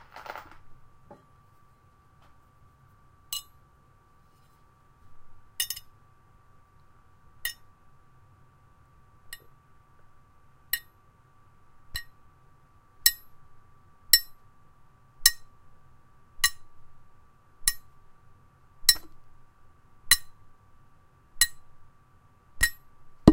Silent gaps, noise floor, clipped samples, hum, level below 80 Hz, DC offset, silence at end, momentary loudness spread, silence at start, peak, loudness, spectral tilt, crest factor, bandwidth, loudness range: none; -59 dBFS; under 0.1%; none; -48 dBFS; under 0.1%; 0 s; 24 LU; 0.15 s; 0 dBFS; -26 LUFS; -2 dB/octave; 34 dB; 16 kHz; 18 LU